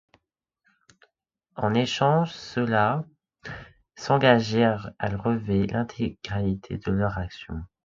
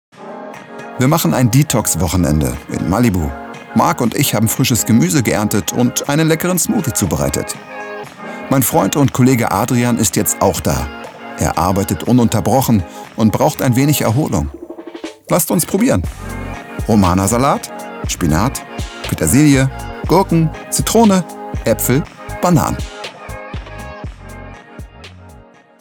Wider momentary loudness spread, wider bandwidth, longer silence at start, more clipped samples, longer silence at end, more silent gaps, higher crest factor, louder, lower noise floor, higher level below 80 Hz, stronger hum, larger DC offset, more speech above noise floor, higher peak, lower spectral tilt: about the same, 19 LU vs 17 LU; second, 7.6 kHz vs over 20 kHz; first, 1.55 s vs 0.2 s; neither; second, 0.2 s vs 0.45 s; neither; first, 22 dB vs 14 dB; second, -25 LUFS vs -15 LUFS; first, -78 dBFS vs -42 dBFS; second, -48 dBFS vs -32 dBFS; neither; neither; first, 53 dB vs 28 dB; second, -4 dBFS vs 0 dBFS; first, -6.5 dB/octave vs -5 dB/octave